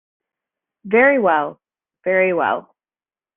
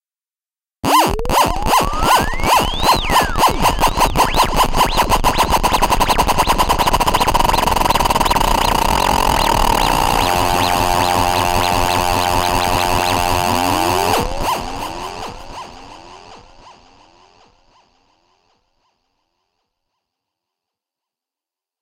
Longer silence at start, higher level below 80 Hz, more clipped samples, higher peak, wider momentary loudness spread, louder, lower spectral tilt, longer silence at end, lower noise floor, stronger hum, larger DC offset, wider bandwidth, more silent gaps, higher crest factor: about the same, 0.85 s vs 0.85 s; second, -66 dBFS vs -26 dBFS; neither; about the same, -2 dBFS vs 0 dBFS; first, 13 LU vs 5 LU; about the same, -17 LUFS vs -15 LUFS; about the same, -3.5 dB/octave vs -3.5 dB/octave; second, 0.75 s vs 5.1 s; about the same, under -90 dBFS vs under -90 dBFS; neither; neither; second, 3.7 kHz vs 17 kHz; neither; about the same, 18 dB vs 16 dB